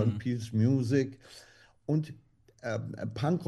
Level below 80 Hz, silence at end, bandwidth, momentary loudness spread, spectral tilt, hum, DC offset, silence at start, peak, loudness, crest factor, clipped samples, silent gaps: -66 dBFS; 0 s; 12 kHz; 19 LU; -8 dB/octave; none; under 0.1%; 0 s; -14 dBFS; -31 LUFS; 16 dB; under 0.1%; none